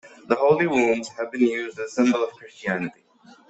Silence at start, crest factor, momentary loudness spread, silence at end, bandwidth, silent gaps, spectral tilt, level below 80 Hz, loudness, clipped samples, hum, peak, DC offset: 0.05 s; 18 dB; 11 LU; 0.6 s; 8.2 kHz; none; -5.5 dB/octave; -66 dBFS; -23 LUFS; under 0.1%; none; -6 dBFS; under 0.1%